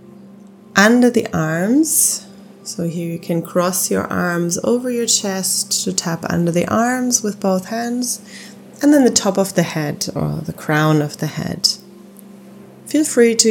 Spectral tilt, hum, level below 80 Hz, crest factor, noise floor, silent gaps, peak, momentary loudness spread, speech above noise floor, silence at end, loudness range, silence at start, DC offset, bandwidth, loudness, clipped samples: -3.5 dB/octave; none; -56 dBFS; 18 dB; -41 dBFS; none; 0 dBFS; 11 LU; 24 dB; 0 s; 3 LU; 0.05 s; under 0.1%; 19 kHz; -17 LUFS; under 0.1%